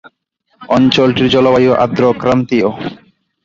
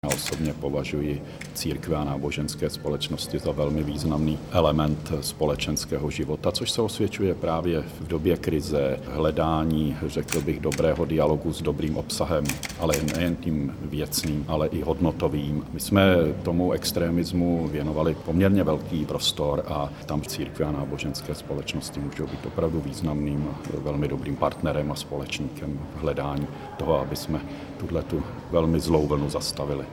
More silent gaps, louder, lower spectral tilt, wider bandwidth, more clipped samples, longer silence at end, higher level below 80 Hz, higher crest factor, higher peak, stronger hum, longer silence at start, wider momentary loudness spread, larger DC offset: neither; first, -12 LUFS vs -26 LUFS; about the same, -6.5 dB/octave vs -5.5 dB/octave; second, 7.6 kHz vs 19.5 kHz; neither; first, 0.5 s vs 0 s; second, -46 dBFS vs -40 dBFS; second, 12 dB vs 22 dB; about the same, -2 dBFS vs -4 dBFS; neither; first, 0.6 s vs 0.05 s; about the same, 7 LU vs 8 LU; neither